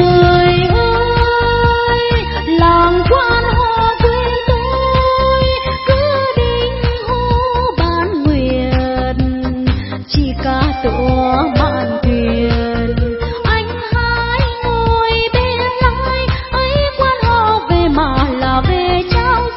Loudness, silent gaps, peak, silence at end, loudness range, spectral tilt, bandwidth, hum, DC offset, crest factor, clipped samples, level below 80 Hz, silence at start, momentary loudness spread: -14 LUFS; none; 0 dBFS; 0 s; 3 LU; -10 dB/octave; 5.8 kHz; none; 0.3%; 12 dB; under 0.1%; -20 dBFS; 0 s; 5 LU